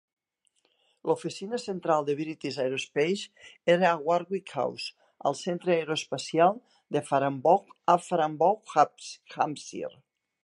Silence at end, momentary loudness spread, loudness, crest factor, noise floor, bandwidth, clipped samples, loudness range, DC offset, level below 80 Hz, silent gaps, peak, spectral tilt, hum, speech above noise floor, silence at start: 0.55 s; 13 LU; -28 LUFS; 20 dB; -73 dBFS; 11.5 kHz; under 0.1%; 4 LU; under 0.1%; -80 dBFS; none; -8 dBFS; -5 dB/octave; none; 46 dB; 1.05 s